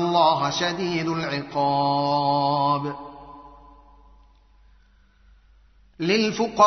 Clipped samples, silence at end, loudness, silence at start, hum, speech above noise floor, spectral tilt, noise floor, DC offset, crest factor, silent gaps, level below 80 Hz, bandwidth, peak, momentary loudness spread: under 0.1%; 0 s; -23 LUFS; 0 s; none; 35 dB; -3.5 dB/octave; -57 dBFS; under 0.1%; 20 dB; none; -56 dBFS; 6.4 kHz; -4 dBFS; 14 LU